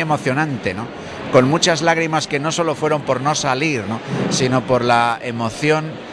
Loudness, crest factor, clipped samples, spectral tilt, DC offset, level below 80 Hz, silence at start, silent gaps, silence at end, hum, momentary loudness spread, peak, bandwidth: -18 LUFS; 16 dB; under 0.1%; -4.5 dB/octave; under 0.1%; -50 dBFS; 0 s; none; 0 s; none; 9 LU; -2 dBFS; 11 kHz